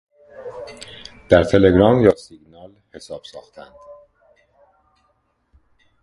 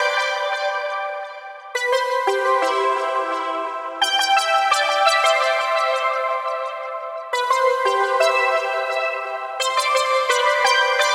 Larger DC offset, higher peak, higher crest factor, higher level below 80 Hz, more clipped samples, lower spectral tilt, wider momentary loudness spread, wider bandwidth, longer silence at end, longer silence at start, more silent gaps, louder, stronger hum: neither; first, 0 dBFS vs -4 dBFS; about the same, 20 dB vs 16 dB; first, -40 dBFS vs -78 dBFS; neither; first, -7 dB/octave vs 1.5 dB/octave; first, 25 LU vs 10 LU; second, 11.5 kHz vs 16.5 kHz; first, 2.4 s vs 0 s; first, 0.4 s vs 0 s; neither; first, -15 LUFS vs -19 LUFS; neither